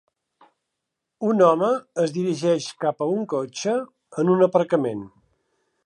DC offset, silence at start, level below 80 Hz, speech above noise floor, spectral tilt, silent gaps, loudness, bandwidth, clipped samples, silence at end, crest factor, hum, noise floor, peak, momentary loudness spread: under 0.1%; 1.2 s; -72 dBFS; 61 dB; -6 dB/octave; none; -22 LUFS; 11 kHz; under 0.1%; 0.75 s; 18 dB; none; -82 dBFS; -4 dBFS; 10 LU